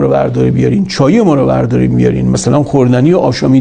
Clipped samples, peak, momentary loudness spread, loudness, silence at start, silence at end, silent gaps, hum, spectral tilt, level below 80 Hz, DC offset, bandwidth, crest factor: 0.3%; 0 dBFS; 3 LU; -10 LUFS; 0 s; 0 s; none; none; -7 dB/octave; -34 dBFS; under 0.1%; 9.8 kHz; 10 dB